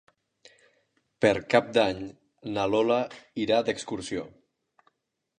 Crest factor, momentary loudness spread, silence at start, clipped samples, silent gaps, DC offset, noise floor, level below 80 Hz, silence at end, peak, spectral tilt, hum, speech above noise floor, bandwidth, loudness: 22 dB; 14 LU; 1.2 s; under 0.1%; none; under 0.1%; -79 dBFS; -62 dBFS; 1.1 s; -6 dBFS; -5 dB/octave; none; 53 dB; 10 kHz; -27 LUFS